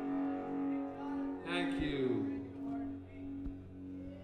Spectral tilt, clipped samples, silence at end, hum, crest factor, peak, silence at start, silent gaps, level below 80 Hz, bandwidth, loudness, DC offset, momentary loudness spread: -7 dB/octave; under 0.1%; 0 s; none; 16 dB; -22 dBFS; 0 s; none; -56 dBFS; 9.6 kHz; -39 LUFS; under 0.1%; 12 LU